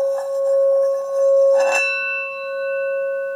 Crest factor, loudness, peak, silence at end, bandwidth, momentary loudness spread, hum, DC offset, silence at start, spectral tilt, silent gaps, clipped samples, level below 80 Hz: 12 dB; -18 LUFS; -8 dBFS; 0 s; 11.5 kHz; 9 LU; none; under 0.1%; 0 s; 0 dB/octave; none; under 0.1%; -86 dBFS